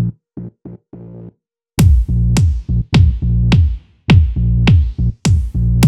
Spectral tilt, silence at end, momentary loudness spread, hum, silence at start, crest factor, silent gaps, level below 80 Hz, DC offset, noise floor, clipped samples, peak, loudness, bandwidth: -6.5 dB/octave; 0 s; 20 LU; none; 0 s; 14 dB; none; -18 dBFS; under 0.1%; -47 dBFS; under 0.1%; 0 dBFS; -14 LUFS; 13.5 kHz